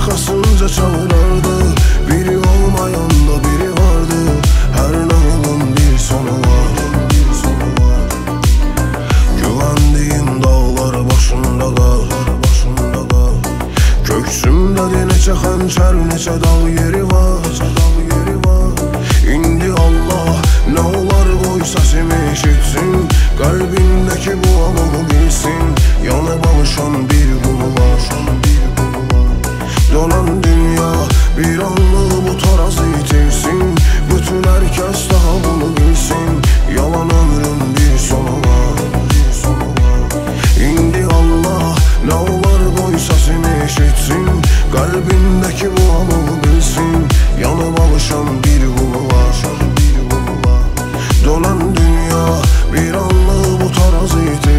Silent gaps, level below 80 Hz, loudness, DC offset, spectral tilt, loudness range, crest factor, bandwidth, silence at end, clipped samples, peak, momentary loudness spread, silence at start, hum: none; -12 dBFS; -13 LUFS; under 0.1%; -5.5 dB/octave; 1 LU; 10 dB; 16 kHz; 0 s; under 0.1%; 0 dBFS; 3 LU; 0 s; none